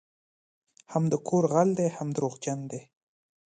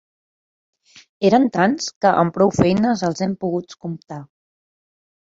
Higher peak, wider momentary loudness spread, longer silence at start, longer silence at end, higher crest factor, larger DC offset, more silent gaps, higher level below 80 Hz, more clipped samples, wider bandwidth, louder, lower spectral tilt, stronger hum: second, -10 dBFS vs -2 dBFS; second, 12 LU vs 16 LU; second, 0.9 s vs 1.2 s; second, 0.7 s vs 1.05 s; about the same, 18 dB vs 18 dB; neither; second, none vs 1.96-2.01 s; second, -72 dBFS vs -52 dBFS; neither; first, 9.4 kHz vs 7.8 kHz; second, -28 LUFS vs -18 LUFS; about the same, -7 dB/octave vs -6 dB/octave; neither